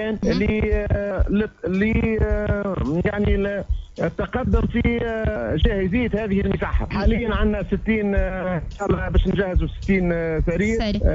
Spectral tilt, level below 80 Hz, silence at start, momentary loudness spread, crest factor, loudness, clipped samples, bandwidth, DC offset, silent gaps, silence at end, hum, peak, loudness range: -8 dB/octave; -26 dBFS; 0 s; 4 LU; 14 dB; -22 LUFS; under 0.1%; 7.6 kHz; under 0.1%; none; 0 s; none; -6 dBFS; 1 LU